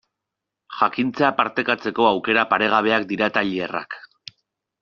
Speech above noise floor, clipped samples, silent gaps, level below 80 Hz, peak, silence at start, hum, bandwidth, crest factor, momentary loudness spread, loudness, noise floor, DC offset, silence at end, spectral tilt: 63 dB; under 0.1%; none; -64 dBFS; -2 dBFS; 0.7 s; none; 7 kHz; 20 dB; 14 LU; -20 LUFS; -84 dBFS; under 0.1%; 0.85 s; -2 dB/octave